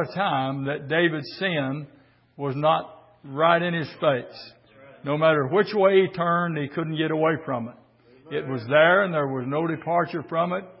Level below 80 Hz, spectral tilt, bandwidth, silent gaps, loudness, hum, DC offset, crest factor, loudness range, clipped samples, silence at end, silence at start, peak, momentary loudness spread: -68 dBFS; -10.5 dB/octave; 5.8 kHz; none; -23 LUFS; none; under 0.1%; 20 dB; 3 LU; under 0.1%; 0.1 s; 0 s; -4 dBFS; 13 LU